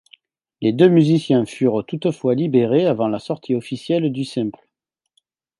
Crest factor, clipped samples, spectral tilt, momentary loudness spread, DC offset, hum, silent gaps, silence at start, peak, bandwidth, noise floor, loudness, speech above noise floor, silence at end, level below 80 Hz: 18 dB; under 0.1%; -8 dB/octave; 10 LU; under 0.1%; none; none; 0.6 s; -2 dBFS; 11.5 kHz; -79 dBFS; -19 LUFS; 61 dB; 1.1 s; -64 dBFS